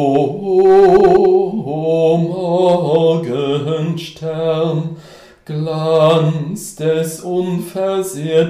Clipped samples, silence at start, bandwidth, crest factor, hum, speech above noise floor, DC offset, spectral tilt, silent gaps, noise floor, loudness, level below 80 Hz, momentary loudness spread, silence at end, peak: under 0.1%; 0 s; 15 kHz; 14 dB; none; 26 dB; under 0.1%; -7 dB/octave; none; -40 dBFS; -15 LUFS; -48 dBFS; 13 LU; 0 s; 0 dBFS